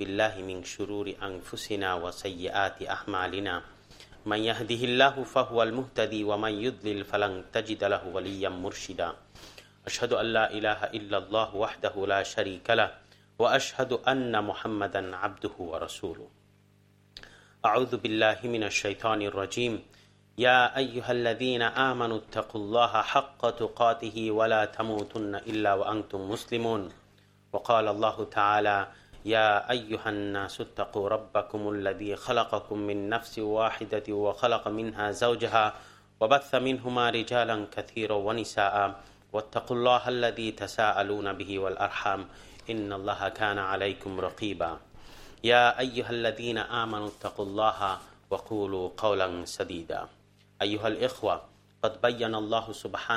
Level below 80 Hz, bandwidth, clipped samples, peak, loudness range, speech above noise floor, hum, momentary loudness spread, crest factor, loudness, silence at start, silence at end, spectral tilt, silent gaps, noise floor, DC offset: -60 dBFS; 15.5 kHz; under 0.1%; -6 dBFS; 5 LU; 33 dB; 50 Hz at -60 dBFS; 11 LU; 24 dB; -29 LUFS; 0 s; 0 s; -4.5 dB/octave; none; -62 dBFS; under 0.1%